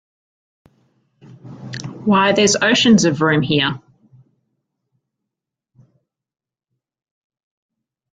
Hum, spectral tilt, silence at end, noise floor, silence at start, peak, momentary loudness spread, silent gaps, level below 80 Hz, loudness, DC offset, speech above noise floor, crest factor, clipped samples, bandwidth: none; -4 dB/octave; 4.4 s; -83 dBFS; 1.45 s; -2 dBFS; 19 LU; none; -58 dBFS; -15 LUFS; under 0.1%; 69 dB; 18 dB; under 0.1%; 9.4 kHz